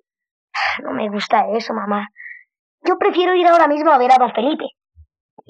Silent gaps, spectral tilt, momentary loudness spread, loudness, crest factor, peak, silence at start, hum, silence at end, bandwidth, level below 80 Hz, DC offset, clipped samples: 2.59-2.78 s; -5 dB/octave; 16 LU; -16 LUFS; 16 dB; -2 dBFS; 0.55 s; none; 0.8 s; 9 kHz; -66 dBFS; under 0.1%; under 0.1%